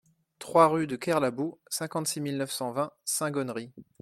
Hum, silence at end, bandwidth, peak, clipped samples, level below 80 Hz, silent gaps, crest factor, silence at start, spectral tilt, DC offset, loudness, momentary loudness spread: none; 0.2 s; 16.5 kHz; -8 dBFS; under 0.1%; -72 dBFS; none; 22 dB; 0.4 s; -4 dB/octave; under 0.1%; -28 LUFS; 13 LU